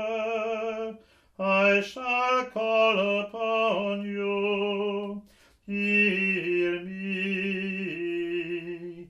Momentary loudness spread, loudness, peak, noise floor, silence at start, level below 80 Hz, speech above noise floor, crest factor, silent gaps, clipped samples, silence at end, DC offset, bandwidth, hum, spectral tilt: 12 LU; -26 LUFS; -10 dBFS; -52 dBFS; 0 s; -68 dBFS; 26 dB; 18 dB; none; under 0.1%; 0.05 s; under 0.1%; 10.5 kHz; none; -6 dB/octave